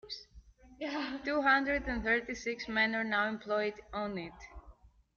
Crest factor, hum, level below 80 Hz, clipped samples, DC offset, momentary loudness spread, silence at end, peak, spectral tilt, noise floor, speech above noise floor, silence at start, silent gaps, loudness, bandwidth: 20 dB; none; -54 dBFS; under 0.1%; under 0.1%; 17 LU; 0.45 s; -16 dBFS; -2 dB/octave; -59 dBFS; 26 dB; 0.05 s; none; -33 LUFS; 7.2 kHz